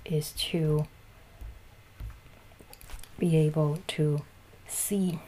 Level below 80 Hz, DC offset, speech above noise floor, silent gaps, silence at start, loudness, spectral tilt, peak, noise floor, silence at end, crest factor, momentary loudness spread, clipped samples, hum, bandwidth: -50 dBFS; under 0.1%; 25 dB; none; 0 s; -29 LUFS; -5.5 dB/octave; -16 dBFS; -52 dBFS; 0 s; 14 dB; 23 LU; under 0.1%; none; 15.5 kHz